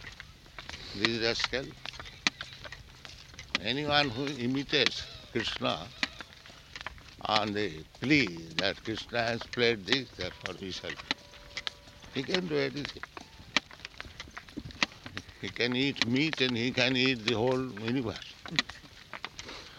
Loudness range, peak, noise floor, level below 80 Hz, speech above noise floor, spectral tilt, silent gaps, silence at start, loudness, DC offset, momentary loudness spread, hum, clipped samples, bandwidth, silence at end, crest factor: 6 LU; -6 dBFS; -52 dBFS; -56 dBFS; 21 dB; -4 dB/octave; none; 0 s; -31 LUFS; under 0.1%; 18 LU; none; under 0.1%; 16 kHz; 0 s; 28 dB